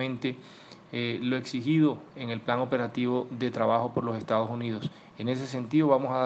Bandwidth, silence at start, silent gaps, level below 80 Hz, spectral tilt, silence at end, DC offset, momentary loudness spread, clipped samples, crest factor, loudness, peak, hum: 8.2 kHz; 0 s; none; -72 dBFS; -7 dB/octave; 0 s; under 0.1%; 11 LU; under 0.1%; 20 dB; -29 LUFS; -8 dBFS; none